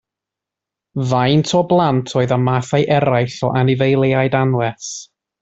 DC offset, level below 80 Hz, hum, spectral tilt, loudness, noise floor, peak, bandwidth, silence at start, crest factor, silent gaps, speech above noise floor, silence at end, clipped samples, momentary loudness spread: under 0.1%; -52 dBFS; none; -6 dB/octave; -16 LUFS; -85 dBFS; -2 dBFS; 8 kHz; 0.95 s; 14 dB; none; 69 dB; 0.35 s; under 0.1%; 9 LU